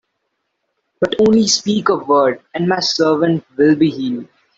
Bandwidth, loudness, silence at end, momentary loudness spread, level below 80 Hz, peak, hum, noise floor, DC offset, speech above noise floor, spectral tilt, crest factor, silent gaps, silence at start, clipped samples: 8 kHz; -15 LUFS; 0.35 s; 9 LU; -54 dBFS; -2 dBFS; none; -72 dBFS; under 0.1%; 57 dB; -4.5 dB/octave; 14 dB; none; 1 s; under 0.1%